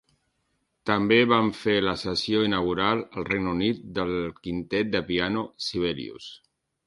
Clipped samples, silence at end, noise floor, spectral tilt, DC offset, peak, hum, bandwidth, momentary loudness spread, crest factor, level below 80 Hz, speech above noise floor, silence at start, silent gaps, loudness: under 0.1%; 0.5 s; -74 dBFS; -5.5 dB/octave; under 0.1%; -6 dBFS; none; 11.5 kHz; 11 LU; 20 dB; -52 dBFS; 49 dB; 0.85 s; none; -25 LUFS